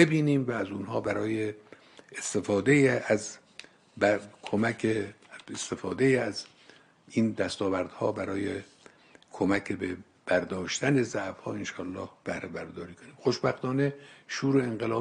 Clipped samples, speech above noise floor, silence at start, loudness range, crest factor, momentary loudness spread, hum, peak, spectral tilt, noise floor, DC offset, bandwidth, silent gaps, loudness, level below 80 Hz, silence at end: under 0.1%; 29 dB; 0 s; 4 LU; 22 dB; 15 LU; none; -6 dBFS; -5.5 dB/octave; -57 dBFS; under 0.1%; 11.5 kHz; none; -29 LUFS; -66 dBFS; 0 s